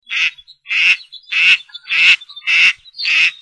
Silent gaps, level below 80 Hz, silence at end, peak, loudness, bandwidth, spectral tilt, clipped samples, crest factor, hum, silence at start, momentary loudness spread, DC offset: none; -66 dBFS; 0.05 s; 0 dBFS; -12 LUFS; 10.5 kHz; 3 dB/octave; under 0.1%; 16 dB; none; 0.1 s; 8 LU; under 0.1%